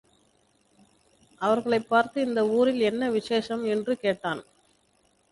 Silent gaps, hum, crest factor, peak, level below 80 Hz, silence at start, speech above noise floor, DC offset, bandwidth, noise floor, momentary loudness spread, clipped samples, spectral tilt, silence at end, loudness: none; 50 Hz at -60 dBFS; 20 dB; -8 dBFS; -66 dBFS; 1.4 s; 42 dB; under 0.1%; 11.5 kHz; -67 dBFS; 7 LU; under 0.1%; -5.5 dB/octave; 0.9 s; -26 LUFS